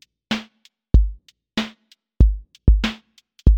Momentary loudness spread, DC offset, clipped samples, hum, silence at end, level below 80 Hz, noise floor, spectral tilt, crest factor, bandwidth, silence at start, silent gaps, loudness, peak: 9 LU; under 0.1%; under 0.1%; none; 0 s; -20 dBFS; -56 dBFS; -6.5 dB/octave; 20 dB; 7.4 kHz; 0.3 s; none; -22 LUFS; 0 dBFS